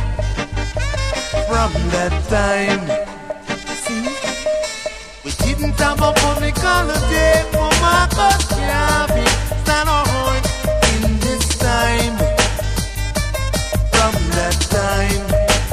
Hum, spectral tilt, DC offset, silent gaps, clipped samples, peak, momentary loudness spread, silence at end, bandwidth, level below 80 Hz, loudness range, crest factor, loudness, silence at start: none; -4 dB/octave; under 0.1%; none; under 0.1%; 0 dBFS; 8 LU; 0 s; 16 kHz; -22 dBFS; 5 LU; 16 dB; -17 LUFS; 0 s